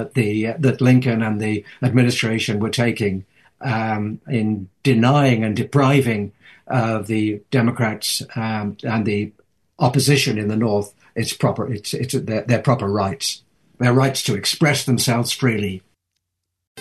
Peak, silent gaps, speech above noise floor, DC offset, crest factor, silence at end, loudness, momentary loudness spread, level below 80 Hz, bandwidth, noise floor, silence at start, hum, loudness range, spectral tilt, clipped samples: -4 dBFS; 16.67-16.75 s; 60 dB; under 0.1%; 16 dB; 0 s; -19 LUFS; 9 LU; -60 dBFS; 12.5 kHz; -78 dBFS; 0 s; none; 3 LU; -5.5 dB/octave; under 0.1%